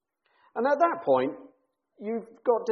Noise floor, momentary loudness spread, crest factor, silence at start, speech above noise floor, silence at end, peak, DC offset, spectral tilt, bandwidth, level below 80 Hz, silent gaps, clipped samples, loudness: -67 dBFS; 15 LU; 18 dB; 0.55 s; 41 dB; 0 s; -10 dBFS; under 0.1%; -4 dB/octave; 6.4 kHz; -78 dBFS; none; under 0.1%; -27 LUFS